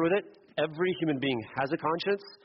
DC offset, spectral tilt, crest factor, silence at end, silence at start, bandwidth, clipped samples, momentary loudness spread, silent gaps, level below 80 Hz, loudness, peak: under 0.1%; -4 dB/octave; 14 dB; 0.1 s; 0 s; 5.8 kHz; under 0.1%; 4 LU; none; -70 dBFS; -31 LUFS; -16 dBFS